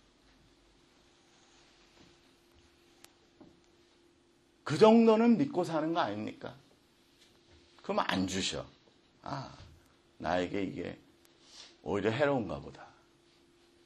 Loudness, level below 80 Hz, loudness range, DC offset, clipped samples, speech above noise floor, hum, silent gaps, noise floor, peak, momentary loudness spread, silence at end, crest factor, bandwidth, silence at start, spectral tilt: -30 LUFS; -66 dBFS; 9 LU; under 0.1%; under 0.1%; 37 dB; none; none; -67 dBFS; -10 dBFS; 26 LU; 1 s; 24 dB; 12 kHz; 4.65 s; -5.5 dB/octave